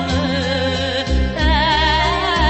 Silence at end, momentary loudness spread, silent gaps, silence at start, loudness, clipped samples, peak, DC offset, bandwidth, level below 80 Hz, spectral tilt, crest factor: 0 s; 5 LU; none; 0 s; -17 LUFS; under 0.1%; -2 dBFS; under 0.1%; 8.4 kHz; -22 dBFS; -5 dB/octave; 14 dB